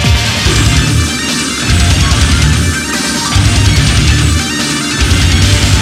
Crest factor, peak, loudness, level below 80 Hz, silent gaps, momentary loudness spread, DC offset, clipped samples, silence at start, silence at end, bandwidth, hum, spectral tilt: 10 dB; 0 dBFS; -10 LUFS; -16 dBFS; none; 4 LU; under 0.1%; under 0.1%; 0 s; 0 s; 15.5 kHz; none; -3.5 dB/octave